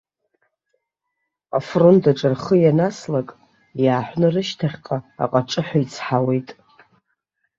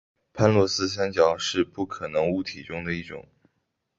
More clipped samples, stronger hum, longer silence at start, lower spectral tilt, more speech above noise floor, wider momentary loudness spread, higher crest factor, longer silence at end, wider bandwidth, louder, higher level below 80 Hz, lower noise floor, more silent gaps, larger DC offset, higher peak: neither; neither; first, 1.55 s vs 0.35 s; first, -7 dB/octave vs -5 dB/octave; first, 59 dB vs 52 dB; about the same, 11 LU vs 12 LU; about the same, 18 dB vs 22 dB; first, 1.05 s vs 0.8 s; about the same, 7.8 kHz vs 8 kHz; first, -19 LUFS vs -25 LUFS; second, -60 dBFS vs -52 dBFS; about the same, -78 dBFS vs -76 dBFS; neither; neither; about the same, -2 dBFS vs -4 dBFS